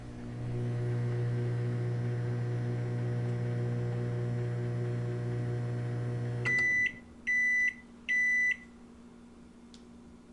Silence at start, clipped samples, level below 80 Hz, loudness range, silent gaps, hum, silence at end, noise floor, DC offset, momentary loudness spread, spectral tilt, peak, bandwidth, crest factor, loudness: 0 s; under 0.1%; -58 dBFS; 5 LU; none; none; 0 s; -53 dBFS; under 0.1%; 9 LU; -6.5 dB/octave; -20 dBFS; 10.5 kHz; 12 dB; -32 LUFS